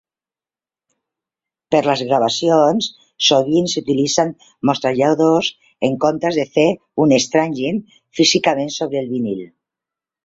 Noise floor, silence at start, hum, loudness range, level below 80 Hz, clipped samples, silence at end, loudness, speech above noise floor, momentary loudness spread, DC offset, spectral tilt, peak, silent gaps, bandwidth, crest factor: under -90 dBFS; 1.7 s; none; 2 LU; -60 dBFS; under 0.1%; 0.8 s; -17 LUFS; over 74 dB; 8 LU; under 0.1%; -4 dB/octave; -2 dBFS; none; 8 kHz; 16 dB